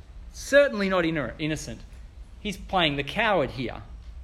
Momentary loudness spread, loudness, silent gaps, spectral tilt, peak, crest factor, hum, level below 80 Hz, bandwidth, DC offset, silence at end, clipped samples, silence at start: 20 LU; -25 LUFS; none; -4.5 dB/octave; -6 dBFS; 20 dB; none; -44 dBFS; 13.5 kHz; under 0.1%; 0 s; under 0.1%; 0.1 s